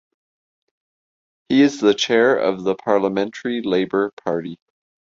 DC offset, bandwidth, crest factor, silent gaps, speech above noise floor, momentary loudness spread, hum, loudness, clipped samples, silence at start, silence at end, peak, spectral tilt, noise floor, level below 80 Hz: under 0.1%; 7.6 kHz; 18 dB; 4.13-4.17 s; over 72 dB; 9 LU; none; -19 LUFS; under 0.1%; 1.5 s; 0.55 s; -4 dBFS; -5 dB/octave; under -90 dBFS; -62 dBFS